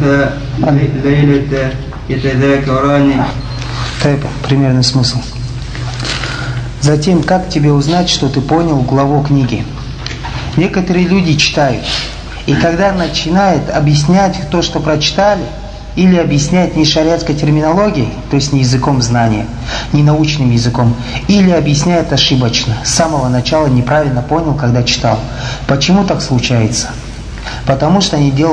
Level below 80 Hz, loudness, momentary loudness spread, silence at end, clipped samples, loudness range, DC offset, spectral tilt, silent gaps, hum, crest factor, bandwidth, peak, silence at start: -28 dBFS; -12 LUFS; 10 LU; 0 s; under 0.1%; 2 LU; under 0.1%; -5.5 dB/octave; none; none; 12 dB; 10.5 kHz; 0 dBFS; 0 s